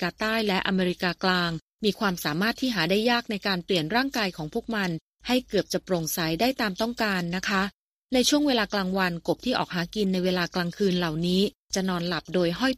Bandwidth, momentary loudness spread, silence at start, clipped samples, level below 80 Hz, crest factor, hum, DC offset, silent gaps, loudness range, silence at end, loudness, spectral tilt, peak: 15.5 kHz; 5 LU; 0 s; under 0.1%; -54 dBFS; 18 dB; none; under 0.1%; 1.62-1.79 s, 5.01-5.13 s, 7.74-8.03 s, 11.55-11.68 s; 2 LU; 0 s; -26 LUFS; -4.5 dB/octave; -8 dBFS